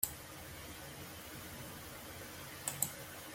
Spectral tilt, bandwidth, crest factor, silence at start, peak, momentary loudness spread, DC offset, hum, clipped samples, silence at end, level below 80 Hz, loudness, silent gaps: -2 dB/octave; 16.5 kHz; 32 dB; 0 s; -14 dBFS; 10 LU; under 0.1%; none; under 0.1%; 0 s; -64 dBFS; -44 LUFS; none